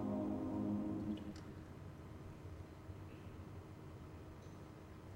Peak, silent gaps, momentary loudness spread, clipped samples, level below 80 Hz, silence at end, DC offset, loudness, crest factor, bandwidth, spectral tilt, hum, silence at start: -30 dBFS; none; 14 LU; under 0.1%; -62 dBFS; 0 s; under 0.1%; -48 LUFS; 16 dB; 16 kHz; -8 dB/octave; none; 0 s